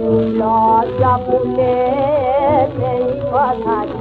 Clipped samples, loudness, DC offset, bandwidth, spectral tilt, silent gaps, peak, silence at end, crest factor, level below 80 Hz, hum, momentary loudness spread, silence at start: under 0.1%; -15 LUFS; under 0.1%; 4.7 kHz; -10 dB/octave; none; -2 dBFS; 0 s; 12 dB; -40 dBFS; none; 4 LU; 0 s